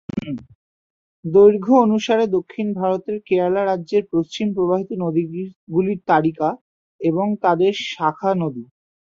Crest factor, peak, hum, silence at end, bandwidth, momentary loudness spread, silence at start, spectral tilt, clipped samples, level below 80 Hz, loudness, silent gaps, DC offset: 18 dB; -2 dBFS; none; 0.45 s; 7.4 kHz; 13 LU; 0.15 s; -7 dB/octave; under 0.1%; -60 dBFS; -19 LUFS; 0.55-1.23 s, 5.56-5.67 s, 6.61-6.99 s; under 0.1%